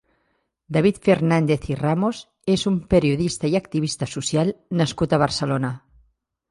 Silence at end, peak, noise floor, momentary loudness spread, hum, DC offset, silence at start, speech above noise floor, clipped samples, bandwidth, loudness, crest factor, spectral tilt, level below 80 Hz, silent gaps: 0.75 s; -4 dBFS; -70 dBFS; 7 LU; none; under 0.1%; 0.7 s; 50 dB; under 0.1%; 11.5 kHz; -22 LUFS; 18 dB; -6 dB/octave; -46 dBFS; none